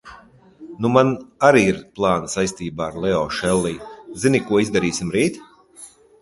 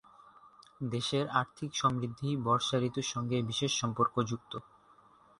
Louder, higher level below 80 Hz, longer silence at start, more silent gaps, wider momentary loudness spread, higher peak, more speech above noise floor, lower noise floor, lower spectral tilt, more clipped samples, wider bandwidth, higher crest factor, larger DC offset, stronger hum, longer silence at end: first, -20 LUFS vs -32 LUFS; first, -48 dBFS vs -66 dBFS; second, 0.05 s vs 0.45 s; neither; first, 11 LU vs 8 LU; first, 0 dBFS vs -14 dBFS; about the same, 28 dB vs 29 dB; second, -47 dBFS vs -62 dBFS; about the same, -5 dB/octave vs -4.5 dB/octave; neither; about the same, 11.5 kHz vs 11.5 kHz; about the same, 20 dB vs 20 dB; neither; neither; second, 0.35 s vs 0.8 s